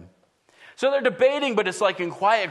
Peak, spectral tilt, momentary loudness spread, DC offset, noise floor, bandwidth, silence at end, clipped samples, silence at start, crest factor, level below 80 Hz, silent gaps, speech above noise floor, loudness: -6 dBFS; -3.5 dB/octave; 4 LU; under 0.1%; -61 dBFS; 11.5 kHz; 0 s; under 0.1%; 0 s; 18 dB; -74 dBFS; none; 39 dB; -22 LUFS